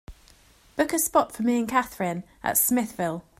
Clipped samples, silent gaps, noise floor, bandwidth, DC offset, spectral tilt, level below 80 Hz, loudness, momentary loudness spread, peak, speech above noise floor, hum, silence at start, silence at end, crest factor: under 0.1%; none; -56 dBFS; 16 kHz; under 0.1%; -4 dB/octave; -54 dBFS; -25 LUFS; 9 LU; -8 dBFS; 31 dB; none; 0.1 s; 0.2 s; 20 dB